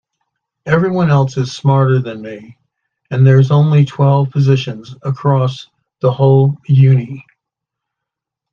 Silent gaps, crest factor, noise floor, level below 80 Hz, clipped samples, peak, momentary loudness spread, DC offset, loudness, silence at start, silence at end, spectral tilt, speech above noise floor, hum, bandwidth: none; 14 dB; -81 dBFS; -54 dBFS; under 0.1%; 0 dBFS; 17 LU; under 0.1%; -13 LUFS; 0.65 s; 1.3 s; -8.5 dB/octave; 69 dB; none; 7 kHz